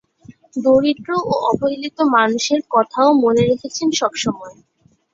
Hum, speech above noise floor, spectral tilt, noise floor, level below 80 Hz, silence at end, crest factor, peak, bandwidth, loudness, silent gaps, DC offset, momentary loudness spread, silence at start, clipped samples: none; 29 dB; -4.5 dB/octave; -45 dBFS; -56 dBFS; 0.6 s; 16 dB; -2 dBFS; 7.8 kHz; -17 LUFS; none; under 0.1%; 8 LU; 0.3 s; under 0.1%